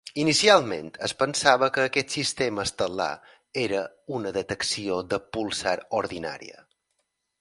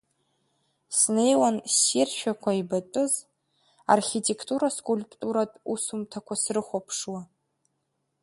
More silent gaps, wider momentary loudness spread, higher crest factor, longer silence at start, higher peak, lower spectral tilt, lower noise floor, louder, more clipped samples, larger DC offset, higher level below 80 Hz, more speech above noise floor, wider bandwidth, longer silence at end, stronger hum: neither; about the same, 13 LU vs 11 LU; about the same, 24 dB vs 22 dB; second, 0.05 s vs 0.9 s; first, -2 dBFS vs -6 dBFS; about the same, -3 dB/octave vs -3 dB/octave; about the same, -77 dBFS vs -77 dBFS; about the same, -25 LUFS vs -26 LUFS; neither; neither; first, -58 dBFS vs -72 dBFS; about the same, 51 dB vs 51 dB; about the same, 11.5 kHz vs 12 kHz; about the same, 0.9 s vs 1 s; neither